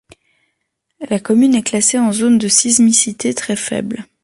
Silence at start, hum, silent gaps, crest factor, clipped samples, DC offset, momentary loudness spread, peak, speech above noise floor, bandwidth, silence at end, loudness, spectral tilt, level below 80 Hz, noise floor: 1 s; none; none; 16 dB; under 0.1%; under 0.1%; 12 LU; 0 dBFS; 57 dB; 11.5 kHz; 0.2 s; -13 LUFS; -3 dB/octave; -56 dBFS; -71 dBFS